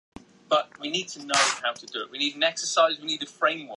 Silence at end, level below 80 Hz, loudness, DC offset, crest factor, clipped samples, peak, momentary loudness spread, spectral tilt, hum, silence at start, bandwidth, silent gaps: 0 s; -70 dBFS; -25 LUFS; under 0.1%; 22 dB; under 0.1%; -4 dBFS; 8 LU; -1 dB/octave; none; 0.5 s; 11.5 kHz; none